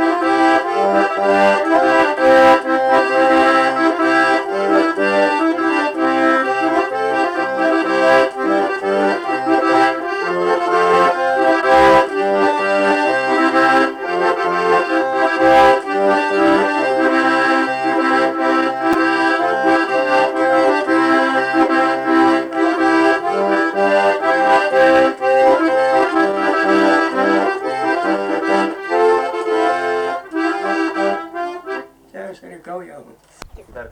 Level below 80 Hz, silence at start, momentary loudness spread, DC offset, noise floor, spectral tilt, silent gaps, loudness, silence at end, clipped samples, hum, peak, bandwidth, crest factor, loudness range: -52 dBFS; 0 s; 7 LU; under 0.1%; -41 dBFS; -4.5 dB/octave; none; -15 LUFS; 0 s; under 0.1%; none; -4 dBFS; 11 kHz; 10 dB; 5 LU